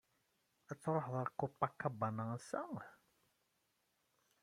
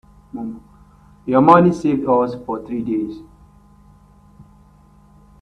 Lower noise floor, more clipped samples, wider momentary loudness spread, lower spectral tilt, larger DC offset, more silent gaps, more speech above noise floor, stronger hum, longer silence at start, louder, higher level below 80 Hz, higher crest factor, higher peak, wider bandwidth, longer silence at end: first, -82 dBFS vs -49 dBFS; neither; second, 11 LU vs 23 LU; about the same, -7.5 dB/octave vs -8.5 dB/octave; neither; neither; first, 41 dB vs 33 dB; second, none vs 50 Hz at -50 dBFS; first, 0.7 s vs 0.35 s; second, -42 LUFS vs -17 LUFS; second, -80 dBFS vs -50 dBFS; about the same, 24 dB vs 20 dB; second, -20 dBFS vs 0 dBFS; first, 15 kHz vs 9.6 kHz; second, 1.5 s vs 2.2 s